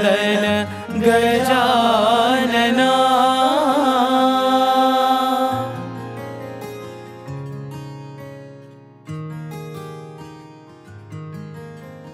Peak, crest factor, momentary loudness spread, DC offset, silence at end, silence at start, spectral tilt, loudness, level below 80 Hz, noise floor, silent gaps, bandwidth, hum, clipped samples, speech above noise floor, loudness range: -2 dBFS; 18 dB; 21 LU; under 0.1%; 0 s; 0 s; -4.5 dB/octave; -16 LUFS; -58 dBFS; -43 dBFS; none; 15.5 kHz; none; under 0.1%; 26 dB; 19 LU